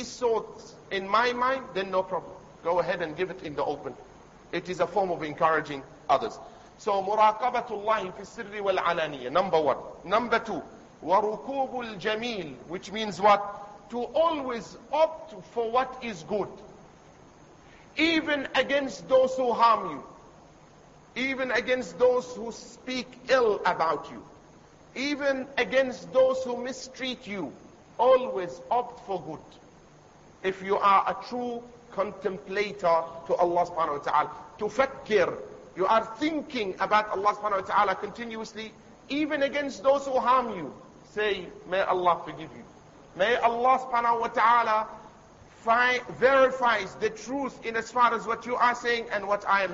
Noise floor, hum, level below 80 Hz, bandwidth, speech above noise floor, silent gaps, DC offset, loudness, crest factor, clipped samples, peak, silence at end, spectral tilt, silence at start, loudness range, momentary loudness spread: -54 dBFS; none; -62 dBFS; 7.8 kHz; 27 dB; none; under 0.1%; -27 LUFS; 20 dB; under 0.1%; -8 dBFS; 0 s; -4 dB/octave; 0 s; 4 LU; 15 LU